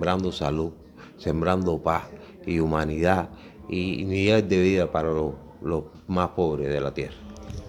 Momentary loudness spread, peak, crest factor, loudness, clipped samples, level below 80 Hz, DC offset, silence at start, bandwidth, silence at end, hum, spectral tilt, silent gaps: 14 LU; -4 dBFS; 20 dB; -25 LUFS; under 0.1%; -44 dBFS; under 0.1%; 0 s; 15 kHz; 0 s; none; -7 dB/octave; none